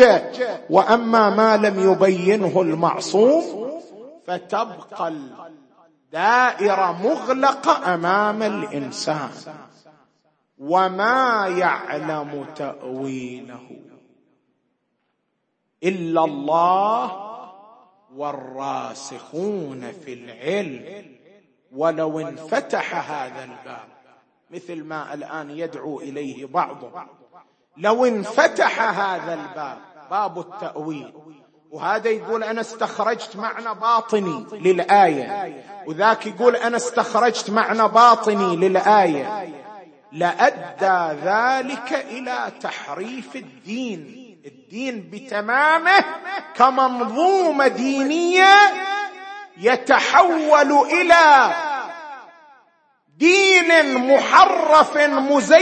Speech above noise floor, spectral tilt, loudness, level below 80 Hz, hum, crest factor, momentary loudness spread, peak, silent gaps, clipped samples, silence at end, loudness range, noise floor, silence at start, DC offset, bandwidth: 54 dB; -4 dB/octave; -18 LUFS; -66 dBFS; none; 20 dB; 19 LU; 0 dBFS; none; under 0.1%; 0 s; 14 LU; -73 dBFS; 0 s; under 0.1%; 8.8 kHz